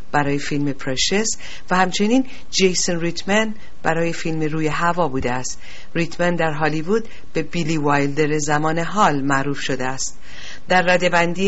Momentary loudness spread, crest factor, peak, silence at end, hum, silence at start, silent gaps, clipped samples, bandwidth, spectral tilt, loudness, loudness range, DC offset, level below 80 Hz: 9 LU; 18 dB; -4 dBFS; 0 s; none; 0.1 s; none; under 0.1%; 8.2 kHz; -4 dB/octave; -20 LUFS; 2 LU; 6%; -44 dBFS